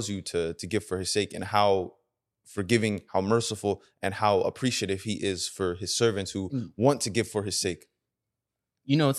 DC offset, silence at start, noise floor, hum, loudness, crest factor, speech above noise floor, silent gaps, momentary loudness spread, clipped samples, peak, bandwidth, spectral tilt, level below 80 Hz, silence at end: under 0.1%; 0 s; -86 dBFS; none; -28 LUFS; 22 dB; 59 dB; none; 8 LU; under 0.1%; -8 dBFS; 13 kHz; -4.5 dB/octave; -62 dBFS; 0 s